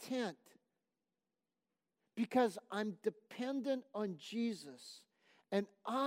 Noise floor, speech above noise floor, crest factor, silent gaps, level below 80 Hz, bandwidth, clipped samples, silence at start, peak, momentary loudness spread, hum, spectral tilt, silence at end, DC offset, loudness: under -90 dBFS; over 50 dB; 20 dB; none; under -90 dBFS; 16 kHz; under 0.1%; 0 s; -22 dBFS; 17 LU; none; -5.5 dB/octave; 0 s; under 0.1%; -40 LUFS